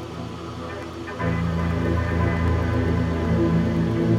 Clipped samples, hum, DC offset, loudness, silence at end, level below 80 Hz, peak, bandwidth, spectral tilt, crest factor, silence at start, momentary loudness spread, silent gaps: under 0.1%; none; under 0.1%; -24 LUFS; 0 s; -34 dBFS; -8 dBFS; 10 kHz; -8 dB/octave; 14 dB; 0 s; 12 LU; none